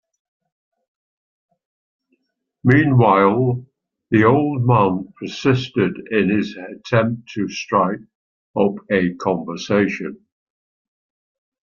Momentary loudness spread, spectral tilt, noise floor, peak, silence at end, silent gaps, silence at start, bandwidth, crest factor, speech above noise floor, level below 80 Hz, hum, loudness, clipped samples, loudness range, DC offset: 14 LU; -7.5 dB/octave; -71 dBFS; -2 dBFS; 1.5 s; 8.15-8.54 s; 2.65 s; 7 kHz; 18 dB; 53 dB; -58 dBFS; none; -18 LUFS; under 0.1%; 6 LU; under 0.1%